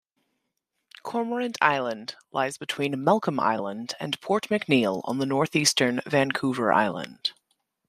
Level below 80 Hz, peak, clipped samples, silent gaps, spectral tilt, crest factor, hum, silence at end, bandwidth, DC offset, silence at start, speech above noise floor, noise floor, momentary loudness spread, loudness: -70 dBFS; -4 dBFS; under 0.1%; none; -4 dB/octave; 22 dB; none; 0.6 s; 15 kHz; under 0.1%; 1.05 s; 54 dB; -80 dBFS; 10 LU; -25 LUFS